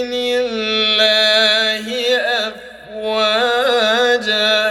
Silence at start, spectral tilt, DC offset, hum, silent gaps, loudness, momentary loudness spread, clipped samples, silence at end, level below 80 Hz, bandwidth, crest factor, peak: 0 s; -1.5 dB/octave; under 0.1%; none; none; -14 LUFS; 10 LU; under 0.1%; 0 s; -56 dBFS; 16.5 kHz; 14 dB; -2 dBFS